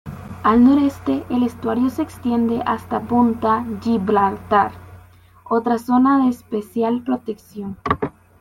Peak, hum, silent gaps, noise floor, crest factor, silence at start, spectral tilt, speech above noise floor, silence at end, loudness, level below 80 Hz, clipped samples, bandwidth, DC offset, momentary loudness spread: -2 dBFS; none; none; -47 dBFS; 16 dB; 0.05 s; -7.5 dB/octave; 28 dB; 0.3 s; -19 LUFS; -48 dBFS; under 0.1%; 14 kHz; under 0.1%; 11 LU